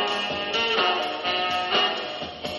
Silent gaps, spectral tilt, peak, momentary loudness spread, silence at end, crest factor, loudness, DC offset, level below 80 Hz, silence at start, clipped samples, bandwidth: none; -2.5 dB/octave; -10 dBFS; 8 LU; 0 s; 16 dB; -24 LUFS; under 0.1%; -60 dBFS; 0 s; under 0.1%; 11.5 kHz